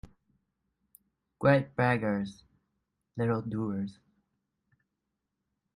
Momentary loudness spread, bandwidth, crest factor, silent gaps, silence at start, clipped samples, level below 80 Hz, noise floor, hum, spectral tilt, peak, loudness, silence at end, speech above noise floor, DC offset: 14 LU; 14.5 kHz; 22 dB; none; 1.4 s; under 0.1%; -64 dBFS; -85 dBFS; none; -8.5 dB/octave; -10 dBFS; -30 LUFS; 1.85 s; 56 dB; under 0.1%